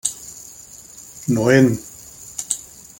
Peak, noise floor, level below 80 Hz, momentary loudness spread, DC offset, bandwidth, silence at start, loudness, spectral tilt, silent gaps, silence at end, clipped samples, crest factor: -2 dBFS; -41 dBFS; -52 dBFS; 23 LU; under 0.1%; 17 kHz; 0.05 s; -19 LUFS; -5 dB/octave; none; 0.4 s; under 0.1%; 20 dB